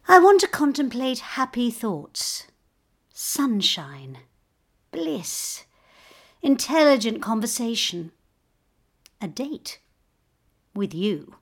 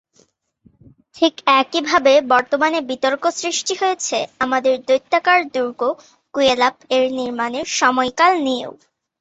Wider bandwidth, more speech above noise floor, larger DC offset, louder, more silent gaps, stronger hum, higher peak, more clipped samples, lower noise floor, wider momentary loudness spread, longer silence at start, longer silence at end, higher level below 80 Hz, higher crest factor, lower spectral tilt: first, 18.5 kHz vs 8.2 kHz; first, 46 dB vs 41 dB; neither; second, -23 LUFS vs -17 LUFS; neither; neither; about the same, -2 dBFS vs -2 dBFS; neither; first, -69 dBFS vs -59 dBFS; first, 20 LU vs 8 LU; second, 0.05 s vs 1.15 s; second, 0.2 s vs 0.5 s; about the same, -66 dBFS vs -62 dBFS; first, 24 dB vs 16 dB; first, -3 dB/octave vs -1.5 dB/octave